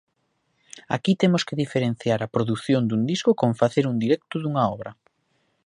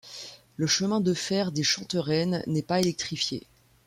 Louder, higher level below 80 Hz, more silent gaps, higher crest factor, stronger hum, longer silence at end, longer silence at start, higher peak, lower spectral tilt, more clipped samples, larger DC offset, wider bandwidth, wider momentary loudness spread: first, -23 LUFS vs -27 LUFS; about the same, -62 dBFS vs -64 dBFS; neither; about the same, 20 dB vs 16 dB; neither; first, 0.75 s vs 0.45 s; first, 0.75 s vs 0.05 s; first, -4 dBFS vs -12 dBFS; first, -6.5 dB/octave vs -4 dB/octave; neither; neither; second, 11 kHz vs 16 kHz; second, 5 LU vs 12 LU